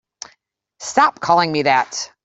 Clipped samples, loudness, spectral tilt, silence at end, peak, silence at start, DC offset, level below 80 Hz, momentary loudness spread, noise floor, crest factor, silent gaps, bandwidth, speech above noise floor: under 0.1%; -17 LUFS; -3 dB/octave; 0.2 s; -2 dBFS; 0.8 s; under 0.1%; -62 dBFS; 22 LU; -62 dBFS; 16 dB; none; 8.2 kHz; 45 dB